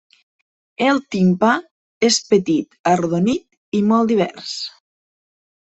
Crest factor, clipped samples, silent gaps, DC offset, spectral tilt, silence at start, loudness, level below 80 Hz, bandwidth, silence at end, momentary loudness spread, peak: 16 dB; under 0.1%; 1.71-2.01 s, 2.79-2.84 s, 3.57-3.72 s; under 0.1%; -5 dB/octave; 0.8 s; -18 LUFS; -58 dBFS; 8.4 kHz; 0.95 s; 10 LU; -2 dBFS